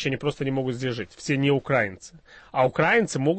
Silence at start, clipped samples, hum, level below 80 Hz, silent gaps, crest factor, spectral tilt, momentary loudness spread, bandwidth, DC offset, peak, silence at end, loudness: 0 s; under 0.1%; none; -56 dBFS; none; 16 dB; -5.5 dB/octave; 10 LU; 8.8 kHz; under 0.1%; -10 dBFS; 0 s; -24 LUFS